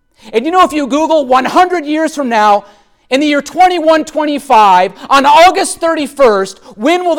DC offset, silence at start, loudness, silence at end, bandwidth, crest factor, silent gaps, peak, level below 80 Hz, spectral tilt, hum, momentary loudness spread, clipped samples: under 0.1%; 0.25 s; -10 LUFS; 0 s; 18 kHz; 10 dB; none; 0 dBFS; -46 dBFS; -3 dB/octave; none; 9 LU; under 0.1%